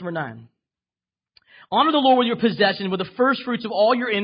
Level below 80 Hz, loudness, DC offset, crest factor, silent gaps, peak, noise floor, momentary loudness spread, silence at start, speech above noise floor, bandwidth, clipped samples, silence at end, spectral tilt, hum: -68 dBFS; -20 LUFS; under 0.1%; 16 dB; none; -4 dBFS; under -90 dBFS; 10 LU; 0 s; over 70 dB; 5.4 kHz; under 0.1%; 0 s; -10 dB/octave; none